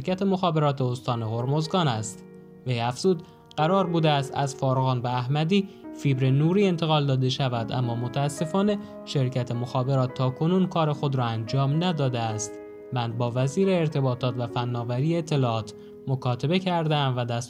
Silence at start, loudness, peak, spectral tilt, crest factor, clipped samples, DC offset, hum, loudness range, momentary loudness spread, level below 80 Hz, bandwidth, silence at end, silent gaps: 0 s; -25 LUFS; -10 dBFS; -6.5 dB/octave; 16 dB; under 0.1%; under 0.1%; none; 2 LU; 8 LU; -64 dBFS; 11.5 kHz; 0 s; none